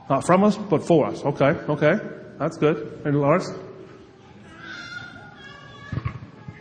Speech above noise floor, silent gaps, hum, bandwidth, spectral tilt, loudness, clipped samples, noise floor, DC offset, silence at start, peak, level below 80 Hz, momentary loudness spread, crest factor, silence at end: 26 dB; none; none; 10 kHz; -7 dB/octave; -22 LUFS; under 0.1%; -47 dBFS; under 0.1%; 0.1 s; -4 dBFS; -54 dBFS; 22 LU; 20 dB; 0 s